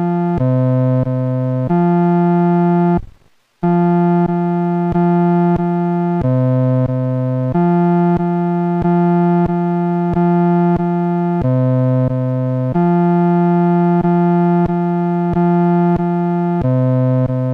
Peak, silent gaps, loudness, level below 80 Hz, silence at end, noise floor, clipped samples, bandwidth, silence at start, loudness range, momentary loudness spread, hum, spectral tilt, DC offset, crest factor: -6 dBFS; none; -15 LUFS; -40 dBFS; 0 s; -51 dBFS; under 0.1%; 3.5 kHz; 0 s; 1 LU; 4 LU; none; -11.5 dB/octave; under 0.1%; 8 dB